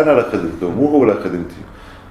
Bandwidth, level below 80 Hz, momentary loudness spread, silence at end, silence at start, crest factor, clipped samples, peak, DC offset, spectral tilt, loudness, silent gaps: 12 kHz; -42 dBFS; 20 LU; 0 s; 0 s; 16 dB; under 0.1%; 0 dBFS; under 0.1%; -8 dB/octave; -16 LUFS; none